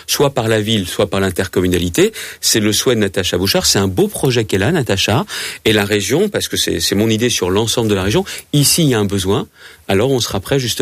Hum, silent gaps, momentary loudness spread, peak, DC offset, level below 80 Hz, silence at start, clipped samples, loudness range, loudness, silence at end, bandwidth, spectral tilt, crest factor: none; none; 5 LU; 0 dBFS; under 0.1%; -40 dBFS; 0.1 s; under 0.1%; 1 LU; -15 LUFS; 0 s; 16 kHz; -4 dB/octave; 14 dB